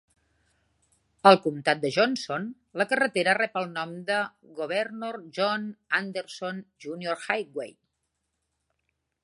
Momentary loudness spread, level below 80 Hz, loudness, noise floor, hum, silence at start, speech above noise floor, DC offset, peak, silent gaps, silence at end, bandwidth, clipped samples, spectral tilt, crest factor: 15 LU; -76 dBFS; -27 LUFS; -79 dBFS; none; 1.25 s; 53 dB; under 0.1%; -2 dBFS; none; 1.55 s; 11.5 kHz; under 0.1%; -4.5 dB/octave; 26 dB